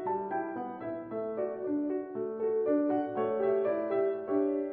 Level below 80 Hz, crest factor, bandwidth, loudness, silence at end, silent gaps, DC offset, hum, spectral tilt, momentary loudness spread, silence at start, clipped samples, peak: -74 dBFS; 14 dB; 3.6 kHz; -32 LUFS; 0 s; none; under 0.1%; none; -10.5 dB/octave; 8 LU; 0 s; under 0.1%; -18 dBFS